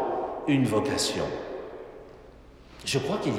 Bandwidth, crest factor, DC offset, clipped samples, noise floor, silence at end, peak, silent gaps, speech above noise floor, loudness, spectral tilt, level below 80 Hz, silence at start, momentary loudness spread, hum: 16 kHz; 16 dB; under 0.1%; under 0.1%; -50 dBFS; 0 s; -12 dBFS; none; 23 dB; -28 LUFS; -4.5 dB/octave; -54 dBFS; 0 s; 20 LU; none